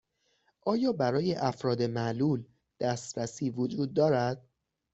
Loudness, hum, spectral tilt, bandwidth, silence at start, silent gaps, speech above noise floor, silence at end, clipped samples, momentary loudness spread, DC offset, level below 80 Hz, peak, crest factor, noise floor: -30 LUFS; none; -6.5 dB/octave; 8.2 kHz; 0.65 s; none; 44 dB; 0.55 s; under 0.1%; 8 LU; under 0.1%; -68 dBFS; -14 dBFS; 18 dB; -73 dBFS